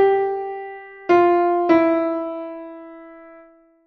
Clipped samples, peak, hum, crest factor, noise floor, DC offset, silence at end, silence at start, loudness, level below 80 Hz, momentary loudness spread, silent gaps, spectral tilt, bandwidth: under 0.1%; -2 dBFS; none; 18 dB; -50 dBFS; under 0.1%; 0.55 s; 0 s; -19 LUFS; -62 dBFS; 20 LU; none; -7 dB/octave; 6 kHz